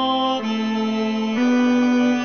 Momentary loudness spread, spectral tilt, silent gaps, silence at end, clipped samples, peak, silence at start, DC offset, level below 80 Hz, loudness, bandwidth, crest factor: 5 LU; -5 dB/octave; none; 0 s; under 0.1%; -10 dBFS; 0 s; 0.3%; -68 dBFS; -20 LUFS; 6.6 kHz; 10 dB